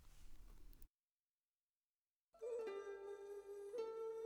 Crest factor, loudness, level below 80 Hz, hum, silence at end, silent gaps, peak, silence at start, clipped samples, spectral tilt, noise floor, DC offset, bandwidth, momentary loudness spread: 16 dB; -51 LUFS; -68 dBFS; none; 0 s; 0.90-1.68 s, 1.75-2.28 s; -36 dBFS; 0 s; under 0.1%; -4.5 dB/octave; under -90 dBFS; under 0.1%; over 20 kHz; 20 LU